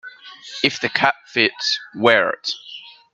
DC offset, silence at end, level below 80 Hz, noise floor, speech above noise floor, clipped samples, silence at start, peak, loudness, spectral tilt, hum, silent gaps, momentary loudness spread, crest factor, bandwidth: under 0.1%; 0.25 s; -70 dBFS; -40 dBFS; 20 dB; under 0.1%; 0.05 s; 0 dBFS; -18 LUFS; -3 dB/octave; none; none; 21 LU; 22 dB; 9 kHz